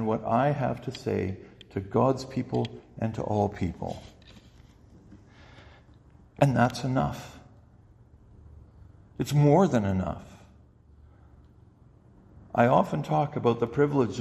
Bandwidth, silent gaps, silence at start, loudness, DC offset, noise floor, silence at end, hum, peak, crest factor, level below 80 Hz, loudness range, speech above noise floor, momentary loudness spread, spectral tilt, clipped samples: 13 kHz; none; 0 s; -27 LUFS; under 0.1%; -56 dBFS; 0 s; none; -8 dBFS; 22 dB; -54 dBFS; 5 LU; 30 dB; 15 LU; -7.5 dB/octave; under 0.1%